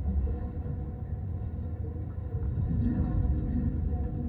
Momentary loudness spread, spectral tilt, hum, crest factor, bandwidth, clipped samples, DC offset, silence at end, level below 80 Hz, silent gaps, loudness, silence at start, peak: 7 LU; -13 dB/octave; none; 14 dB; 2.8 kHz; under 0.1%; under 0.1%; 0 s; -34 dBFS; none; -33 LUFS; 0 s; -16 dBFS